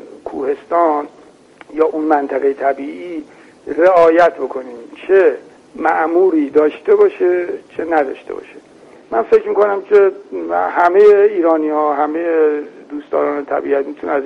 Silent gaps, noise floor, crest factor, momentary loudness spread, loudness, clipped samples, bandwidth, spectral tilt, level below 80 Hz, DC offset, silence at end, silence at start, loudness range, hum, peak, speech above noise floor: none; -43 dBFS; 14 dB; 18 LU; -14 LUFS; under 0.1%; 6.6 kHz; -6.5 dB/octave; -58 dBFS; under 0.1%; 0 s; 0.05 s; 4 LU; none; -2 dBFS; 29 dB